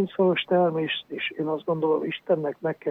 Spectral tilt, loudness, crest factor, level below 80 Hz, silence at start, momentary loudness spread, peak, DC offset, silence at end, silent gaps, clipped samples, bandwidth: -8.5 dB/octave; -25 LUFS; 16 dB; -72 dBFS; 0 s; 7 LU; -10 dBFS; under 0.1%; 0 s; none; under 0.1%; 4.2 kHz